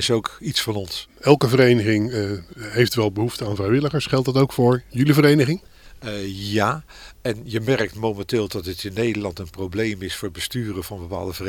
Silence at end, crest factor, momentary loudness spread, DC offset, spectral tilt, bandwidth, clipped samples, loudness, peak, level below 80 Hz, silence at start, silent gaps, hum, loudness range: 0 s; 22 dB; 14 LU; under 0.1%; -6 dB/octave; 18 kHz; under 0.1%; -21 LUFS; 0 dBFS; -48 dBFS; 0 s; none; none; 6 LU